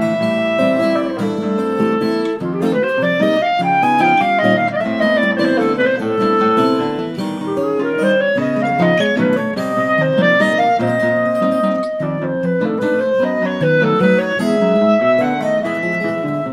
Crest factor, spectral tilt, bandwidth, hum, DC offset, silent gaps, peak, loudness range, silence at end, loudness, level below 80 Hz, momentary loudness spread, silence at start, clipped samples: 14 dB; -7 dB/octave; 14.5 kHz; none; under 0.1%; none; 0 dBFS; 2 LU; 0 s; -16 LUFS; -58 dBFS; 6 LU; 0 s; under 0.1%